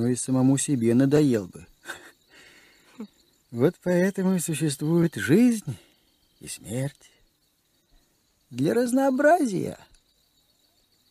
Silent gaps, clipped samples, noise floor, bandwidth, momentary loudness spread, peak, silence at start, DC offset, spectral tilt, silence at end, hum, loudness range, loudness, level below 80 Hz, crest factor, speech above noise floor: none; under 0.1%; -68 dBFS; 15 kHz; 21 LU; -8 dBFS; 0 s; under 0.1%; -6 dB/octave; 1.35 s; none; 5 LU; -23 LUFS; -64 dBFS; 18 dB; 45 dB